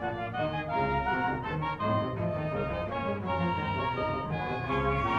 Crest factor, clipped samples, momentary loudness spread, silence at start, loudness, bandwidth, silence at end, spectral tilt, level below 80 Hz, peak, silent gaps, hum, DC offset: 14 dB; under 0.1%; 4 LU; 0 s; -31 LUFS; 8.2 kHz; 0 s; -8 dB/octave; -46 dBFS; -16 dBFS; none; none; under 0.1%